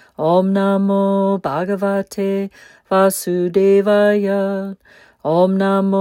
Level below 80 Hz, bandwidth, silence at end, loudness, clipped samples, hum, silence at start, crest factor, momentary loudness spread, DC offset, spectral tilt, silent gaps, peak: -62 dBFS; 16.5 kHz; 0 s; -16 LUFS; under 0.1%; none; 0.2 s; 14 dB; 8 LU; under 0.1%; -6.5 dB/octave; none; -2 dBFS